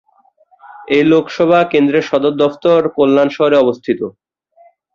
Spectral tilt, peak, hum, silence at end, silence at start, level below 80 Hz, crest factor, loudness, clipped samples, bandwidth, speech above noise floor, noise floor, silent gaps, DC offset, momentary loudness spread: -7 dB/octave; 0 dBFS; none; 0.85 s; 0.75 s; -56 dBFS; 14 dB; -13 LUFS; under 0.1%; 7.2 kHz; 41 dB; -53 dBFS; none; under 0.1%; 7 LU